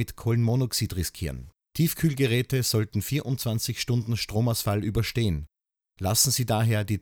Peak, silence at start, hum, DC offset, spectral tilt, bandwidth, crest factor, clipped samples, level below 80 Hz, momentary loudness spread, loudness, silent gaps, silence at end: -6 dBFS; 0 s; none; under 0.1%; -4.5 dB/octave; over 20 kHz; 20 dB; under 0.1%; -46 dBFS; 9 LU; -26 LUFS; none; 0 s